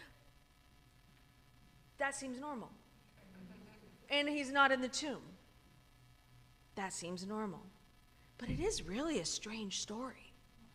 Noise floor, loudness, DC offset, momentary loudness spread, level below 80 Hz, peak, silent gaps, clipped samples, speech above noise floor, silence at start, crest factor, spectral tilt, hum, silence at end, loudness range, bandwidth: -66 dBFS; -39 LUFS; under 0.1%; 26 LU; -62 dBFS; -18 dBFS; none; under 0.1%; 27 dB; 0 s; 24 dB; -3 dB/octave; none; 0.05 s; 10 LU; 15.5 kHz